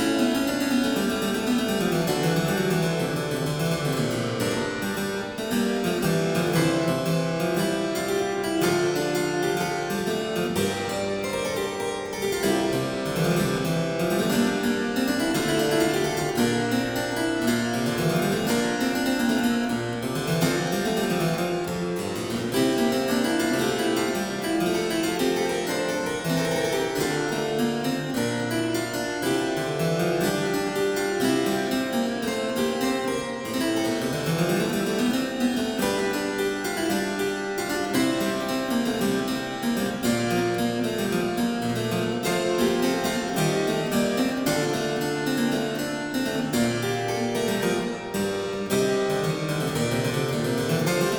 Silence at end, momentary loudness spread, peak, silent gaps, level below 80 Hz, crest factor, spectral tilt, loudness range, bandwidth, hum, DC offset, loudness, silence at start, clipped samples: 0 s; 4 LU; -8 dBFS; none; -52 dBFS; 16 dB; -4.5 dB/octave; 2 LU; over 20 kHz; none; under 0.1%; -25 LUFS; 0 s; under 0.1%